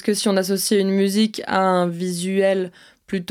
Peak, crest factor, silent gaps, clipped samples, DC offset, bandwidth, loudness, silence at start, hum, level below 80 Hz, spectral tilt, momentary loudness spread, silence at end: -4 dBFS; 16 dB; none; under 0.1%; under 0.1%; 17 kHz; -20 LUFS; 0.05 s; none; -66 dBFS; -4.5 dB/octave; 7 LU; 0.05 s